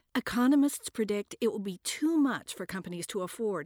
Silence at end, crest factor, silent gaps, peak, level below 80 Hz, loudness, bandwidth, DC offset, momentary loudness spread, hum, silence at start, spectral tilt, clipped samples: 0 s; 14 dB; none; -18 dBFS; -66 dBFS; -31 LUFS; 19.5 kHz; under 0.1%; 12 LU; none; 0.15 s; -4.5 dB/octave; under 0.1%